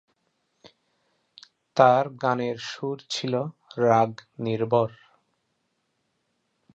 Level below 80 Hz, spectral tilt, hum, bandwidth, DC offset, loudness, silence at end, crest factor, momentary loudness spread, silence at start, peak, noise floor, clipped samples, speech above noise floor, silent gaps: -70 dBFS; -6 dB/octave; none; 8.6 kHz; under 0.1%; -25 LUFS; 1.9 s; 24 dB; 13 LU; 1.75 s; -4 dBFS; -75 dBFS; under 0.1%; 51 dB; none